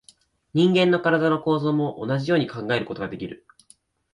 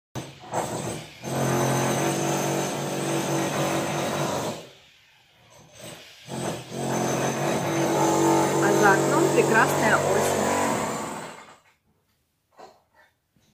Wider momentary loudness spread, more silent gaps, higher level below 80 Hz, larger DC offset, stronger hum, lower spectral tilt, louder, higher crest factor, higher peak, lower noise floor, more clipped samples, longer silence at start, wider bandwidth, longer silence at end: second, 12 LU vs 18 LU; neither; about the same, -60 dBFS vs -62 dBFS; neither; neither; first, -7 dB/octave vs -4.5 dB/octave; about the same, -22 LUFS vs -24 LUFS; about the same, 16 dB vs 20 dB; about the same, -6 dBFS vs -6 dBFS; second, -58 dBFS vs -71 dBFS; neither; first, 0.55 s vs 0.15 s; second, 11 kHz vs 16 kHz; about the same, 0.8 s vs 0.85 s